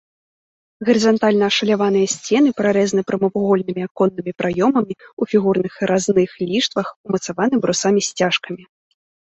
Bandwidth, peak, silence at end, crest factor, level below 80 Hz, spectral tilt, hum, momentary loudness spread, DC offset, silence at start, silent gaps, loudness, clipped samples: 8.2 kHz; -2 dBFS; 0.75 s; 16 dB; -60 dBFS; -4.5 dB/octave; none; 8 LU; under 0.1%; 0.8 s; 3.91-3.95 s, 5.13-5.17 s, 6.96-7.04 s; -18 LUFS; under 0.1%